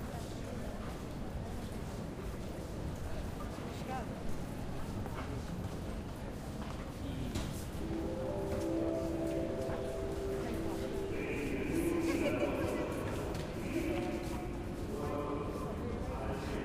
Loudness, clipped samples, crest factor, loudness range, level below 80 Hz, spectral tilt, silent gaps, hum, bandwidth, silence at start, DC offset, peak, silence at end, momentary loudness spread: -39 LUFS; under 0.1%; 16 dB; 6 LU; -46 dBFS; -6.5 dB/octave; none; none; 15.5 kHz; 0 s; under 0.1%; -22 dBFS; 0 s; 8 LU